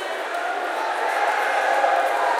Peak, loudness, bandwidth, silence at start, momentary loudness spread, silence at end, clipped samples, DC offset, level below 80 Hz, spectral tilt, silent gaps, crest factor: -6 dBFS; -22 LUFS; 16 kHz; 0 s; 6 LU; 0 s; under 0.1%; under 0.1%; -86 dBFS; 1 dB/octave; none; 16 dB